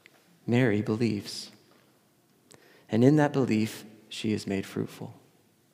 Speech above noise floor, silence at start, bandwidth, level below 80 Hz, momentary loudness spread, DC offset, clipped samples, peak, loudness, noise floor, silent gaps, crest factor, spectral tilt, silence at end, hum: 38 dB; 0.45 s; 16 kHz; -78 dBFS; 19 LU; under 0.1%; under 0.1%; -8 dBFS; -27 LUFS; -65 dBFS; none; 22 dB; -6.5 dB/octave; 0.6 s; none